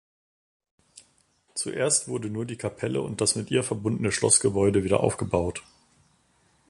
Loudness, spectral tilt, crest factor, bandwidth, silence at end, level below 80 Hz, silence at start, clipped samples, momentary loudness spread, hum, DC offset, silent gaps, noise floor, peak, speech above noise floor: -25 LUFS; -4 dB/octave; 22 dB; 11.5 kHz; 1.1 s; -50 dBFS; 1.55 s; under 0.1%; 13 LU; none; under 0.1%; none; -66 dBFS; -6 dBFS; 41 dB